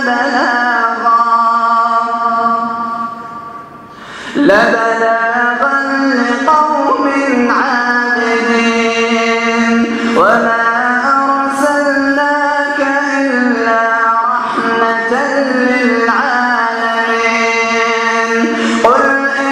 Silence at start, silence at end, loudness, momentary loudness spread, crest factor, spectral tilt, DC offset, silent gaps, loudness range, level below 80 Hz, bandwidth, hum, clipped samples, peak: 0 s; 0 s; -11 LUFS; 4 LU; 12 dB; -3.5 dB/octave; under 0.1%; none; 2 LU; -54 dBFS; 12.5 kHz; none; under 0.1%; 0 dBFS